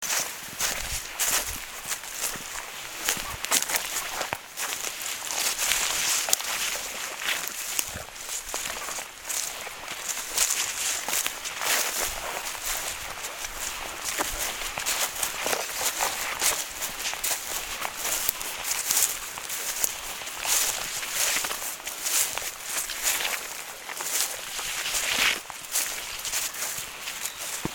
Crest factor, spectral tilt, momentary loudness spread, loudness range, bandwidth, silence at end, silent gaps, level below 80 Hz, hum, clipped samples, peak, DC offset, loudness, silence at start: 30 dB; 1 dB/octave; 9 LU; 3 LU; 17.5 kHz; 0 s; none; -52 dBFS; none; under 0.1%; 0 dBFS; under 0.1%; -27 LUFS; 0 s